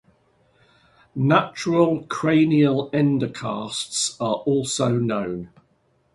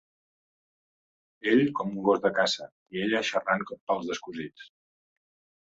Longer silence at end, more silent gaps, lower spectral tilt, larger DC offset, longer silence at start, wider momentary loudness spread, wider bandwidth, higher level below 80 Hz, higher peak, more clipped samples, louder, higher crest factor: second, 0.7 s vs 0.95 s; second, none vs 2.72-2.86 s, 3.81-3.87 s; about the same, -5.5 dB/octave vs -4.5 dB/octave; neither; second, 1.15 s vs 1.45 s; second, 10 LU vs 13 LU; first, 11.5 kHz vs 8 kHz; first, -60 dBFS vs -70 dBFS; first, -2 dBFS vs -10 dBFS; neither; first, -21 LUFS vs -28 LUFS; about the same, 20 dB vs 20 dB